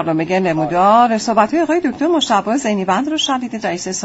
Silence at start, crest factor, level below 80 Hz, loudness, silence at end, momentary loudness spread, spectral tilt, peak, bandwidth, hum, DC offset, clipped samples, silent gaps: 0 s; 14 dB; -54 dBFS; -15 LUFS; 0 s; 7 LU; -4.5 dB/octave; 0 dBFS; 8 kHz; none; under 0.1%; under 0.1%; none